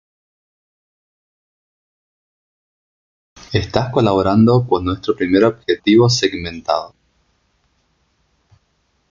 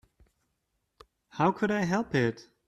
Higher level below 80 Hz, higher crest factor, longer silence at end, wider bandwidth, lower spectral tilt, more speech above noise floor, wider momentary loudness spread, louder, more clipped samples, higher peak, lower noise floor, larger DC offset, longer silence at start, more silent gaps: first, -50 dBFS vs -64 dBFS; about the same, 18 dB vs 20 dB; first, 2.2 s vs 0.25 s; second, 7.4 kHz vs 12 kHz; about the same, -6 dB/octave vs -6.5 dB/octave; about the same, 49 dB vs 52 dB; first, 10 LU vs 4 LU; first, -16 LUFS vs -28 LUFS; neither; first, -2 dBFS vs -12 dBFS; second, -64 dBFS vs -79 dBFS; neither; first, 3.5 s vs 1.35 s; neither